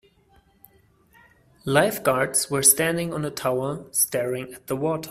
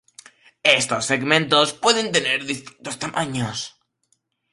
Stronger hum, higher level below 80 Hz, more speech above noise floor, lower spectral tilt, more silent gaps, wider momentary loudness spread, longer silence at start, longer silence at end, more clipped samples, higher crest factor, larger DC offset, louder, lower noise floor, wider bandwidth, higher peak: neither; about the same, -60 dBFS vs -62 dBFS; second, 36 dB vs 48 dB; about the same, -3 dB/octave vs -2.5 dB/octave; neither; about the same, 12 LU vs 13 LU; first, 1.65 s vs 0.65 s; second, 0 s vs 0.85 s; neither; about the same, 24 dB vs 22 dB; neither; about the same, -22 LUFS vs -20 LUFS; second, -59 dBFS vs -69 dBFS; first, 16 kHz vs 11.5 kHz; about the same, -2 dBFS vs 0 dBFS